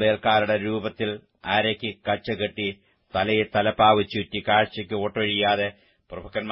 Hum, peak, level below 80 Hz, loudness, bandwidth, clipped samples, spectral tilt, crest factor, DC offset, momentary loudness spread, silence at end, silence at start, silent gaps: none; -4 dBFS; -56 dBFS; -24 LUFS; 5.8 kHz; under 0.1%; -9.5 dB/octave; 20 dB; under 0.1%; 11 LU; 0 s; 0 s; none